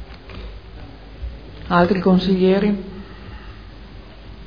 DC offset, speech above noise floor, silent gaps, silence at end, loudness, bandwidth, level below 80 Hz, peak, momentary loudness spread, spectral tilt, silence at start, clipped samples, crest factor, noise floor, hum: 0.4%; 23 dB; none; 0 s; -17 LUFS; 5.2 kHz; -38 dBFS; -2 dBFS; 24 LU; -9 dB/octave; 0 s; under 0.1%; 20 dB; -38 dBFS; none